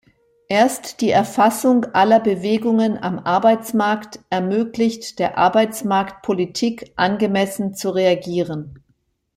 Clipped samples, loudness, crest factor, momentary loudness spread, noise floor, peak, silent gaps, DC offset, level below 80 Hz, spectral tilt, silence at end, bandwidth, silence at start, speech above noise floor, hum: under 0.1%; -19 LUFS; 16 dB; 8 LU; -65 dBFS; -2 dBFS; none; under 0.1%; -58 dBFS; -5 dB/octave; 0.6 s; 16 kHz; 0.5 s; 47 dB; none